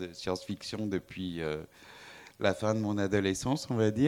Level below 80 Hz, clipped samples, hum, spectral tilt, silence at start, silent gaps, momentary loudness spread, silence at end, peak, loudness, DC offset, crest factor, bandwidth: -60 dBFS; under 0.1%; none; -5.5 dB/octave; 0 s; none; 20 LU; 0 s; -12 dBFS; -33 LUFS; under 0.1%; 20 dB; 17 kHz